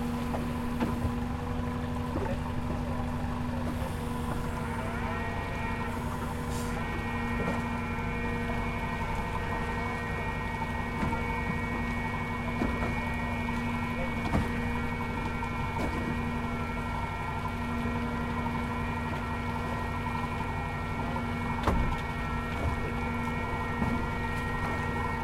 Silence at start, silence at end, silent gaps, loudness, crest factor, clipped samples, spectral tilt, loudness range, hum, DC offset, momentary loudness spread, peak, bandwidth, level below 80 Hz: 0 s; 0 s; none; -32 LUFS; 20 dB; under 0.1%; -6.5 dB/octave; 2 LU; none; under 0.1%; 3 LU; -10 dBFS; 16.5 kHz; -40 dBFS